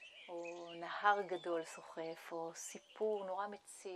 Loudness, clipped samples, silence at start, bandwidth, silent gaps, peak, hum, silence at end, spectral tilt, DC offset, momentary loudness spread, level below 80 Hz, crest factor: -42 LUFS; under 0.1%; 0 s; 13.5 kHz; none; -18 dBFS; none; 0 s; -3 dB/octave; under 0.1%; 14 LU; under -90 dBFS; 24 dB